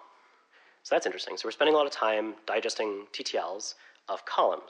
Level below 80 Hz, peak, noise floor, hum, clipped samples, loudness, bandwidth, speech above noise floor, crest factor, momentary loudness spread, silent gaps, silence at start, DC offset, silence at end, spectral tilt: under -90 dBFS; -12 dBFS; -62 dBFS; none; under 0.1%; -30 LUFS; 10.5 kHz; 32 dB; 18 dB; 13 LU; none; 0 s; under 0.1%; 0 s; -1.5 dB/octave